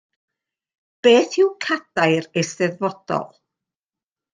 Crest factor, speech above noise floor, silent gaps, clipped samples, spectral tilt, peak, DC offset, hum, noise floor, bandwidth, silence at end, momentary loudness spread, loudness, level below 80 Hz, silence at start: 20 dB; over 71 dB; none; under 0.1%; -4.5 dB/octave; -2 dBFS; under 0.1%; none; under -90 dBFS; 9.6 kHz; 1.05 s; 11 LU; -20 LUFS; -70 dBFS; 1.05 s